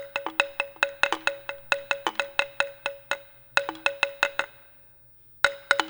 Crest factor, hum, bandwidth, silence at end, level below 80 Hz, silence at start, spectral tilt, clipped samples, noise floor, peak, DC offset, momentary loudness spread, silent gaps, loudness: 28 dB; none; over 20 kHz; 0 s; -66 dBFS; 0 s; -1 dB/octave; under 0.1%; -51 dBFS; -2 dBFS; under 0.1%; 8 LU; none; -27 LUFS